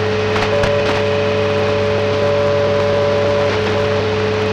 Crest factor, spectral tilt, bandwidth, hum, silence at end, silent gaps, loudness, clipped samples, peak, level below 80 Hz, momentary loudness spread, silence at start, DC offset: 12 dB; -6 dB/octave; 10 kHz; none; 0 s; none; -16 LUFS; under 0.1%; -4 dBFS; -38 dBFS; 2 LU; 0 s; under 0.1%